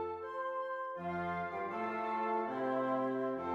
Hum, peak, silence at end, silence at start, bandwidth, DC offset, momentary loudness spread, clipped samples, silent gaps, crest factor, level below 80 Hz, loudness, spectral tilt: none; -24 dBFS; 0 s; 0 s; 7.8 kHz; under 0.1%; 5 LU; under 0.1%; none; 12 dB; -74 dBFS; -37 LUFS; -8 dB/octave